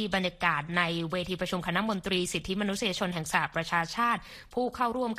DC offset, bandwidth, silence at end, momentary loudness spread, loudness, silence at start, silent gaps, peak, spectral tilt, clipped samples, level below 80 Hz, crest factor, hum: under 0.1%; 15 kHz; 0 s; 5 LU; -30 LUFS; 0 s; none; -10 dBFS; -4 dB/octave; under 0.1%; -54 dBFS; 20 dB; none